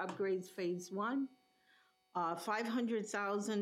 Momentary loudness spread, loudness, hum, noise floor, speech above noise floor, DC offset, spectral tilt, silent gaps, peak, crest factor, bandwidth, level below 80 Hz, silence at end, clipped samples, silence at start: 4 LU; -39 LUFS; none; -72 dBFS; 34 dB; under 0.1%; -5 dB/octave; none; -24 dBFS; 14 dB; 15.5 kHz; under -90 dBFS; 0 s; under 0.1%; 0 s